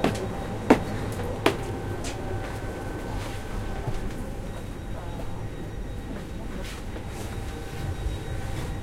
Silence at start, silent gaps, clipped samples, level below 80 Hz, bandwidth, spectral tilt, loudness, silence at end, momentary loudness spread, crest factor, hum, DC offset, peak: 0 s; none; under 0.1%; -36 dBFS; 16 kHz; -6 dB/octave; -31 LUFS; 0 s; 10 LU; 28 dB; none; under 0.1%; -2 dBFS